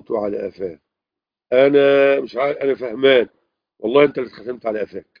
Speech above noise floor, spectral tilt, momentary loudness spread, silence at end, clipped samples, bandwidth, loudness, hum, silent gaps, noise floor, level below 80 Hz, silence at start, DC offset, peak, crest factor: 70 dB; -7.5 dB/octave; 16 LU; 0.2 s; under 0.1%; 5.2 kHz; -17 LUFS; none; none; -87 dBFS; -62 dBFS; 0.1 s; under 0.1%; 0 dBFS; 18 dB